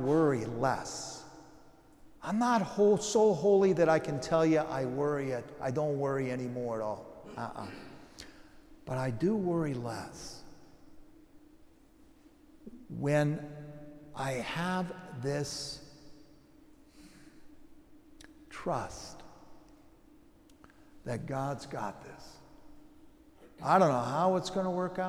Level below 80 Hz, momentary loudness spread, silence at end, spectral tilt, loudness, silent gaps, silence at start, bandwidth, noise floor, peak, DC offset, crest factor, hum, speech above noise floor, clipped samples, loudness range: -62 dBFS; 23 LU; 0 s; -6 dB/octave; -31 LUFS; none; 0 s; 14 kHz; -59 dBFS; -12 dBFS; under 0.1%; 22 dB; none; 29 dB; under 0.1%; 16 LU